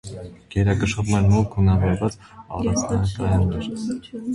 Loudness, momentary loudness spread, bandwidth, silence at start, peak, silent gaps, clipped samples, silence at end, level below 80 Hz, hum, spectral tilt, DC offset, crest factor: -22 LUFS; 12 LU; 11.5 kHz; 0.05 s; -6 dBFS; none; under 0.1%; 0 s; -34 dBFS; none; -6.5 dB/octave; under 0.1%; 14 dB